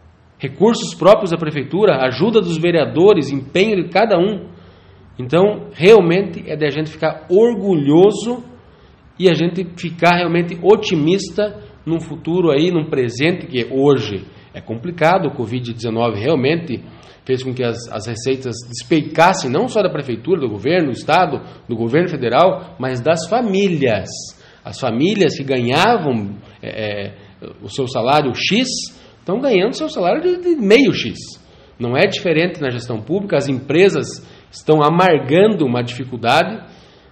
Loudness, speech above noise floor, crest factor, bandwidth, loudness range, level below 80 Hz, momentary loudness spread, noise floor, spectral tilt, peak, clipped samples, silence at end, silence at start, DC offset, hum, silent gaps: -16 LUFS; 30 dB; 16 dB; 10.5 kHz; 4 LU; -52 dBFS; 15 LU; -46 dBFS; -6 dB/octave; 0 dBFS; under 0.1%; 0.45 s; 0.4 s; under 0.1%; none; none